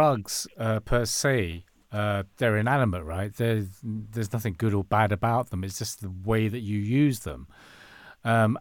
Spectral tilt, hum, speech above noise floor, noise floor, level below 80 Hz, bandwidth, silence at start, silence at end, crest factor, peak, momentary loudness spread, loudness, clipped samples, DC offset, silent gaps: -5.5 dB/octave; none; 24 dB; -50 dBFS; -46 dBFS; 18.5 kHz; 0 s; 0 s; 18 dB; -8 dBFS; 11 LU; -27 LUFS; under 0.1%; under 0.1%; none